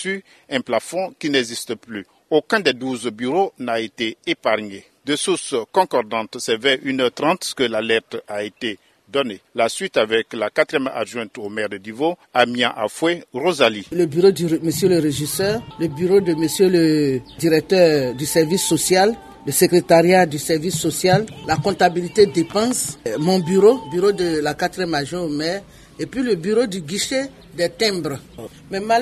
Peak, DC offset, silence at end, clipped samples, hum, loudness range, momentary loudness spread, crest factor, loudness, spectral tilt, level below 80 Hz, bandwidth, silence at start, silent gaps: 0 dBFS; under 0.1%; 0 s; under 0.1%; none; 5 LU; 11 LU; 20 dB; -19 LUFS; -4 dB/octave; -54 dBFS; 13.5 kHz; 0 s; none